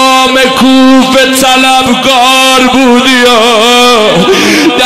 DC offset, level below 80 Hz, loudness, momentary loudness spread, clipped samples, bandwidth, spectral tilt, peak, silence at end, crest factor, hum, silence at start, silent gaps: under 0.1%; -36 dBFS; -4 LUFS; 2 LU; 2%; 16 kHz; -2.5 dB/octave; 0 dBFS; 0 s; 4 dB; none; 0 s; none